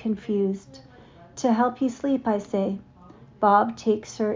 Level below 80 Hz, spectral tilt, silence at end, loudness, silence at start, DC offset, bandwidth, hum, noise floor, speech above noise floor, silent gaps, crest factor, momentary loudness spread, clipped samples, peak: -60 dBFS; -6.5 dB/octave; 0 s; -24 LUFS; 0 s; under 0.1%; 7.6 kHz; none; -49 dBFS; 26 dB; none; 18 dB; 9 LU; under 0.1%; -6 dBFS